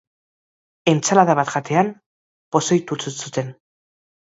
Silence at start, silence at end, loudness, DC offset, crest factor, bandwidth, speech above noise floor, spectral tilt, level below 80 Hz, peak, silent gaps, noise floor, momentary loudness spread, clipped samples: 0.85 s; 0.8 s; -20 LUFS; under 0.1%; 22 dB; 8 kHz; over 71 dB; -4.5 dB/octave; -66 dBFS; 0 dBFS; 2.06-2.52 s; under -90 dBFS; 12 LU; under 0.1%